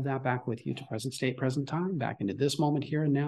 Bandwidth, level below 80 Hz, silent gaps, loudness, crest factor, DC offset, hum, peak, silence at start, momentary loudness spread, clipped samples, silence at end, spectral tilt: 12.5 kHz; -70 dBFS; none; -31 LUFS; 18 dB; under 0.1%; none; -14 dBFS; 0 s; 7 LU; under 0.1%; 0 s; -6.5 dB/octave